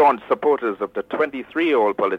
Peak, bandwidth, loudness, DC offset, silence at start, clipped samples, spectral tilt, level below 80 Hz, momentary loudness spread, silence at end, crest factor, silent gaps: -6 dBFS; 6 kHz; -21 LUFS; under 0.1%; 0 s; under 0.1%; -6.5 dB/octave; -64 dBFS; 7 LU; 0 s; 14 dB; none